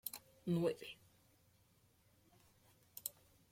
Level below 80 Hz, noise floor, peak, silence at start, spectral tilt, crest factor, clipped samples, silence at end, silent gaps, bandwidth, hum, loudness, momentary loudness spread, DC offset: -80 dBFS; -73 dBFS; -22 dBFS; 0.05 s; -5.5 dB/octave; 24 dB; under 0.1%; 0.4 s; none; 16.5 kHz; none; -43 LUFS; 18 LU; under 0.1%